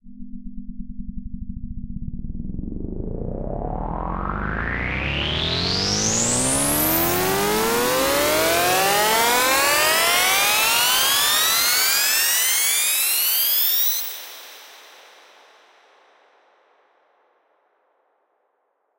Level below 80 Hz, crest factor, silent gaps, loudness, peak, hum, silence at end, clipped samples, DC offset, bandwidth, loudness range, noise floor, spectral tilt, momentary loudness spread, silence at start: -36 dBFS; 16 dB; none; -18 LUFS; -6 dBFS; none; 4.15 s; under 0.1%; under 0.1%; 16 kHz; 15 LU; -70 dBFS; -1.5 dB/octave; 20 LU; 0.05 s